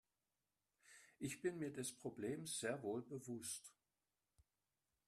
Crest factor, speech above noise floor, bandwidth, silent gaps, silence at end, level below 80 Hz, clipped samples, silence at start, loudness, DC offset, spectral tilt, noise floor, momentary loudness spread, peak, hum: 20 dB; over 43 dB; 13.5 kHz; none; 1.35 s; -84 dBFS; under 0.1%; 0.85 s; -48 LUFS; under 0.1%; -4 dB/octave; under -90 dBFS; 20 LU; -32 dBFS; none